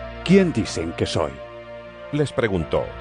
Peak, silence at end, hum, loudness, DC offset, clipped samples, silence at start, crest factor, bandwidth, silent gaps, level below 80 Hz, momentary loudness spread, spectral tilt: -4 dBFS; 0 s; none; -22 LUFS; under 0.1%; under 0.1%; 0 s; 18 dB; 10 kHz; none; -42 dBFS; 20 LU; -6 dB/octave